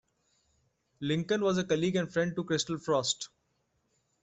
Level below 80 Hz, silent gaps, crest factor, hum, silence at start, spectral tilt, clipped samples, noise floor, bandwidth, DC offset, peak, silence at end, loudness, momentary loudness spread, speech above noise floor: -68 dBFS; none; 18 dB; none; 1 s; -4.5 dB/octave; under 0.1%; -76 dBFS; 8.2 kHz; under 0.1%; -16 dBFS; 0.95 s; -31 LUFS; 6 LU; 46 dB